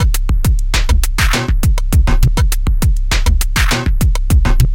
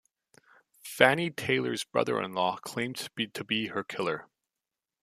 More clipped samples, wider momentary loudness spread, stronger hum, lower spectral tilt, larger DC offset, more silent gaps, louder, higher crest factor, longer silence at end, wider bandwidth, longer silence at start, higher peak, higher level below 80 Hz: neither; second, 2 LU vs 11 LU; neither; about the same, -4.5 dB/octave vs -4 dB/octave; neither; neither; first, -15 LUFS vs -29 LUFS; second, 12 dB vs 28 dB; second, 0 s vs 0.8 s; first, 17 kHz vs 15 kHz; second, 0 s vs 0.85 s; about the same, 0 dBFS vs -2 dBFS; first, -12 dBFS vs -72 dBFS